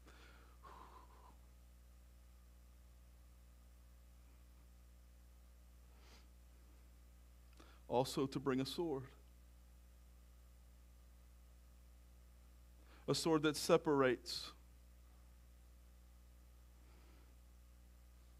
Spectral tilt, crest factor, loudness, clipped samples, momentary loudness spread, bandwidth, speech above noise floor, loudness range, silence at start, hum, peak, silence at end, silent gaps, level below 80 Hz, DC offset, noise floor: -5 dB/octave; 28 dB; -39 LUFS; under 0.1%; 28 LU; 15.5 kHz; 25 dB; 26 LU; 0.05 s; 60 Hz at -65 dBFS; -18 dBFS; 1.45 s; none; -64 dBFS; under 0.1%; -63 dBFS